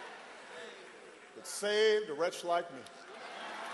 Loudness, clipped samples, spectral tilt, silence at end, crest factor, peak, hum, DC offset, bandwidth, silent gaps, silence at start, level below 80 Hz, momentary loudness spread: -33 LUFS; under 0.1%; -2 dB/octave; 0 s; 18 dB; -18 dBFS; none; under 0.1%; 12.5 kHz; none; 0 s; -86 dBFS; 21 LU